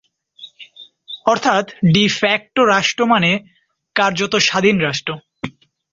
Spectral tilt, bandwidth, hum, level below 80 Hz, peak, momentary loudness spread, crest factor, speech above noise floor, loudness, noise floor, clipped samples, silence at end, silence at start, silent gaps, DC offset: -4.5 dB/octave; 7.8 kHz; none; -54 dBFS; 0 dBFS; 18 LU; 18 dB; 27 dB; -16 LUFS; -43 dBFS; under 0.1%; 0.4 s; 0.4 s; none; under 0.1%